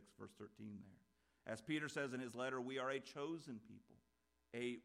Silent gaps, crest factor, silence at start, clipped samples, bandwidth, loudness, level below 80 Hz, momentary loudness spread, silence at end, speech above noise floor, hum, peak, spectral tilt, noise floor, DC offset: none; 18 dB; 0 s; under 0.1%; 15 kHz; -48 LUFS; -86 dBFS; 15 LU; 0.05 s; 25 dB; none; -30 dBFS; -5 dB/octave; -72 dBFS; under 0.1%